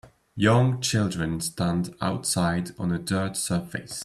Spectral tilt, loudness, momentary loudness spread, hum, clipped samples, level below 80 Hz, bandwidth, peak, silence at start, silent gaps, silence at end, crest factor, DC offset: -5 dB/octave; -25 LUFS; 8 LU; none; under 0.1%; -54 dBFS; 14 kHz; -6 dBFS; 0.05 s; none; 0 s; 18 dB; under 0.1%